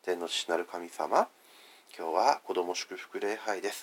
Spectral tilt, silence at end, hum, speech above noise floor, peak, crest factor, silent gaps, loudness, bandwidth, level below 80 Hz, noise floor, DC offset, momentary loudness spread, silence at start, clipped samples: -1.5 dB/octave; 0 s; none; 25 dB; -10 dBFS; 22 dB; none; -32 LUFS; 17 kHz; under -90 dBFS; -57 dBFS; under 0.1%; 11 LU; 0.05 s; under 0.1%